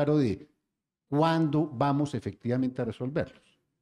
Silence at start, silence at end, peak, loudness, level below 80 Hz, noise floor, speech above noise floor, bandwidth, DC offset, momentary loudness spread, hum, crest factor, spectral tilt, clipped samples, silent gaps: 0 s; 0.5 s; -12 dBFS; -29 LUFS; -62 dBFS; -85 dBFS; 57 dB; 10.5 kHz; under 0.1%; 9 LU; none; 16 dB; -8 dB/octave; under 0.1%; none